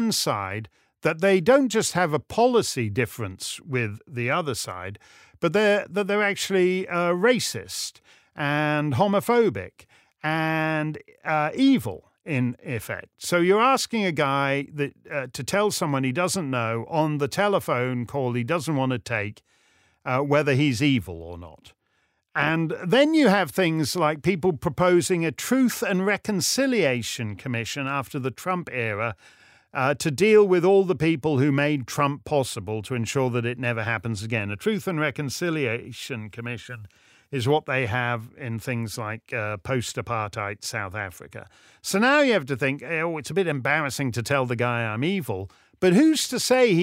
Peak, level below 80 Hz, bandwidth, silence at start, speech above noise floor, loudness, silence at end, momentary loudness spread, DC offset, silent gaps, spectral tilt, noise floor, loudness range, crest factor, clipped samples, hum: -6 dBFS; -60 dBFS; 16 kHz; 0 s; 47 dB; -24 LUFS; 0 s; 13 LU; under 0.1%; none; -5 dB/octave; -70 dBFS; 6 LU; 18 dB; under 0.1%; none